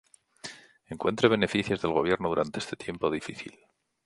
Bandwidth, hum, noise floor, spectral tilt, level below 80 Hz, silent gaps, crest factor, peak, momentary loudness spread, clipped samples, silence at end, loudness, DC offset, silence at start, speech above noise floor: 11.5 kHz; none; -47 dBFS; -5.5 dB/octave; -58 dBFS; none; 24 dB; -4 dBFS; 19 LU; under 0.1%; 0.55 s; -28 LUFS; under 0.1%; 0.45 s; 19 dB